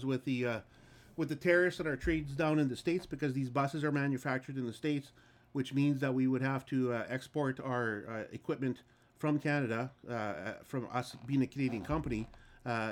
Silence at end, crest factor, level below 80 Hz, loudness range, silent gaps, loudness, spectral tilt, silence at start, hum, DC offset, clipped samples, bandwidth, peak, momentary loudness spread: 0 s; 20 dB; -56 dBFS; 4 LU; none; -35 LUFS; -7 dB/octave; 0 s; none; under 0.1%; under 0.1%; 15.5 kHz; -16 dBFS; 9 LU